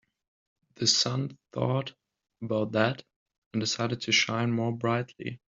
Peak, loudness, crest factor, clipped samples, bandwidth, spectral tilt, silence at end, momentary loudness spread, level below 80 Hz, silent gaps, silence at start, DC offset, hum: -8 dBFS; -28 LUFS; 22 dB; under 0.1%; 7.8 kHz; -3.5 dB/octave; 0.15 s; 14 LU; -68 dBFS; 3.16-3.26 s, 3.38-3.51 s; 0.8 s; under 0.1%; none